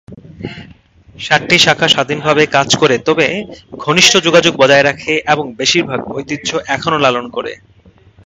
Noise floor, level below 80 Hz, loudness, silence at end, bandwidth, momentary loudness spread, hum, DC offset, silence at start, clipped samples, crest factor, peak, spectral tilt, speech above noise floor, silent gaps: -45 dBFS; -48 dBFS; -11 LUFS; 0.75 s; 16 kHz; 15 LU; none; under 0.1%; 0.1 s; 0.2%; 14 dB; 0 dBFS; -3 dB/octave; 32 dB; none